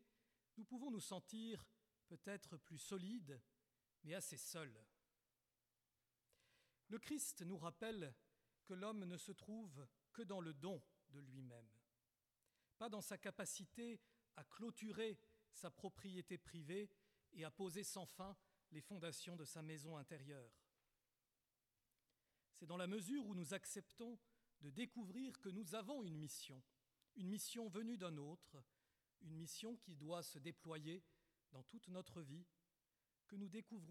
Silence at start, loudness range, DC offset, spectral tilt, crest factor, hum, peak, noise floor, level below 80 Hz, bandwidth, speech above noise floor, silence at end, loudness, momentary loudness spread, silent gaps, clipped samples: 0 s; 5 LU; under 0.1%; -4.5 dB/octave; 20 dB; none; -34 dBFS; under -90 dBFS; -88 dBFS; 16 kHz; over 37 dB; 0 s; -53 LUFS; 14 LU; none; under 0.1%